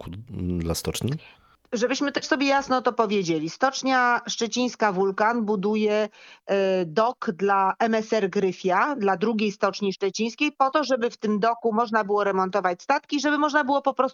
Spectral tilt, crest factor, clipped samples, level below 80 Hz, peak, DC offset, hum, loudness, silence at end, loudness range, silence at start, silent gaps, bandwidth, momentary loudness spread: -4.5 dB/octave; 18 dB; under 0.1%; -54 dBFS; -6 dBFS; under 0.1%; none; -24 LUFS; 0 s; 1 LU; 0 s; none; 16 kHz; 6 LU